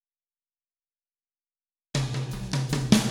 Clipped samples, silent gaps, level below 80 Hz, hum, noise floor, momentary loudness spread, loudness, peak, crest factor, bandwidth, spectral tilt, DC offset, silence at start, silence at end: under 0.1%; none; -48 dBFS; none; under -90 dBFS; 10 LU; -28 LUFS; -4 dBFS; 26 dB; 17.5 kHz; -5 dB/octave; under 0.1%; 1.95 s; 0 s